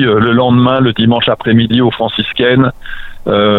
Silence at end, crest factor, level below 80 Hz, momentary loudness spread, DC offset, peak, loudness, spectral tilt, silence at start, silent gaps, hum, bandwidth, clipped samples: 0 s; 10 dB; -36 dBFS; 6 LU; under 0.1%; 0 dBFS; -11 LUFS; -9 dB/octave; 0 s; none; none; 4.3 kHz; under 0.1%